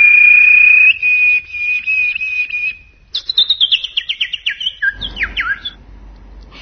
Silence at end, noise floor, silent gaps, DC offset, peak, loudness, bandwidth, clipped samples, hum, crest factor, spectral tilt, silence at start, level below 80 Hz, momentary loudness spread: 0 s; -37 dBFS; none; under 0.1%; 0 dBFS; -10 LUFS; 6.4 kHz; under 0.1%; none; 14 dB; -0.5 dB/octave; 0 s; -40 dBFS; 16 LU